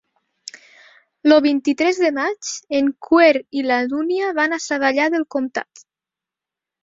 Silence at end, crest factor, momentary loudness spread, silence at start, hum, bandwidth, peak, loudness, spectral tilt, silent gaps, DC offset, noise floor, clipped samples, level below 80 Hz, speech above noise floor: 1.2 s; 18 dB; 15 LU; 0.55 s; none; 7.8 kHz; -2 dBFS; -18 LUFS; -2.5 dB/octave; none; under 0.1%; -88 dBFS; under 0.1%; -64 dBFS; 70 dB